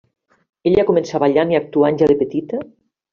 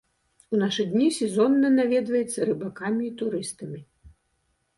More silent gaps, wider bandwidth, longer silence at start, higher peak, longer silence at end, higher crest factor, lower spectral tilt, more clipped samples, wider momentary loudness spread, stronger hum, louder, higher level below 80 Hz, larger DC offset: neither; second, 7.2 kHz vs 11.5 kHz; first, 0.65 s vs 0.5 s; first, -2 dBFS vs -10 dBFS; second, 0.45 s vs 0.7 s; about the same, 14 dB vs 16 dB; about the same, -6 dB/octave vs -5 dB/octave; neither; second, 9 LU vs 12 LU; neither; first, -17 LUFS vs -24 LUFS; first, -50 dBFS vs -64 dBFS; neither